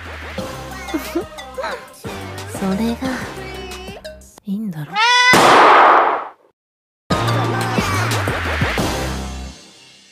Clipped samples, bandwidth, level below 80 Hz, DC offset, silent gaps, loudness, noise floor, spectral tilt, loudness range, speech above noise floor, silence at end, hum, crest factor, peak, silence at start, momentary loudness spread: under 0.1%; 16 kHz; -36 dBFS; under 0.1%; 6.53-7.10 s; -16 LUFS; -45 dBFS; -4 dB/octave; 12 LU; 22 dB; 0.5 s; none; 18 dB; 0 dBFS; 0 s; 22 LU